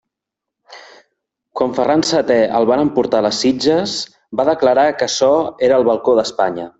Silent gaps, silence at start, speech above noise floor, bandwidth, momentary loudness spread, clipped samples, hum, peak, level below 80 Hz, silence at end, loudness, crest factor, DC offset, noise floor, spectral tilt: none; 0.7 s; 68 dB; 8.2 kHz; 6 LU; under 0.1%; none; -2 dBFS; -54 dBFS; 0.1 s; -15 LUFS; 14 dB; under 0.1%; -83 dBFS; -4 dB/octave